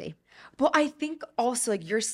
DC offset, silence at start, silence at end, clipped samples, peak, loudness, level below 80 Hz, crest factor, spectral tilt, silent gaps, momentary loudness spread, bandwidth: under 0.1%; 0 s; 0 s; under 0.1%; -8 dBFS; -27 LUFS; -68 dBFS; 20 dB; -3 dB/octave; none; 10 LU; 16 kHz